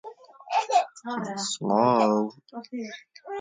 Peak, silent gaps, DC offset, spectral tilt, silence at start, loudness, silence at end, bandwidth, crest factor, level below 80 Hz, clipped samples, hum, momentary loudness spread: -8 dBFS; none; under 0.1%; -4.5 dB/octave; 0.05 s; -26 LUFS; 0 s; 9.6 kHz; 20 dB; -78 dBFS; under 0.1%; none; 18 LU